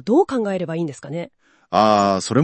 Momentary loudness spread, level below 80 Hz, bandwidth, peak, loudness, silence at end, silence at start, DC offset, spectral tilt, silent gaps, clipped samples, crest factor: 15 LU; -62 dBFS; 8.8 kHz; 0 dBFS; -19 LUFS; 0 s; 0.05 s; under 0.1%; -6 dB/octave; none; under 0.1%; 18 dB